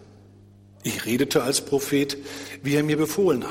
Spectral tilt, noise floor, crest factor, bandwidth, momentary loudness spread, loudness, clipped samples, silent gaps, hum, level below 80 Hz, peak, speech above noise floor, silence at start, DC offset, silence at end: -4.5 dB/octave; -50 dBFS; 18 dB; 16.5 kHz; 11 LU; -24 LUFS; under 0.1%; none; 50 Hz at -50 dBFS; -60 dBFS; -8 dBFS; 27 dB; 0 s; under 0.1%; 0 s